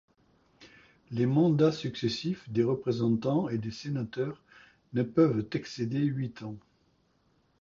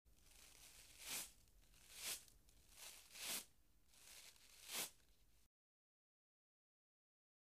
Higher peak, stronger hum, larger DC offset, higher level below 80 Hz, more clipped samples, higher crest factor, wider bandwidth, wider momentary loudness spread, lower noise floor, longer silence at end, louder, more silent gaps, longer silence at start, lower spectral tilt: first, -12 dBFS vs -32 dBFS; neither; neither; first, -64 dBFS vs -78 dBFS; neither; second, 18 dB vs 26 dB; second, 7.4 kHz vs 15.5 kHz; second, 12 LU vs 19 LU; second, -70 dBFS vs -76 dBFS; second, 1.05 s vs 2 s; first, -30 LUFS vs -52 LUFS; neither; first, 0.6 s vs 0.05 s; first, -7.5 dB/octave vs 0.5 dB/octave